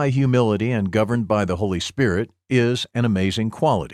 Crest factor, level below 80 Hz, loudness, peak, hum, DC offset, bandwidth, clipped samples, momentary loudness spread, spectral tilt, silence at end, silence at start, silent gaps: 14 dB; -48 dBFS; -21 LUFS; -6 dBFS; none; under 0.1%; 12.5 kHz; under 0.1%; 4 LU; -6.5 dB/octave; 0 s; 0 s; none